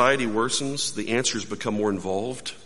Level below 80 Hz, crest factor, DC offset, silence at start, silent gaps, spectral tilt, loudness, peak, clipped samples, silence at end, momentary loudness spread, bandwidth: -60 dBFS; 22 dB; 1%; 0 s; none; -3 dB/octave; -25 LUFS; -4 dBFS; under 0.1%; 0 s; 5 LU; 11.5 kHz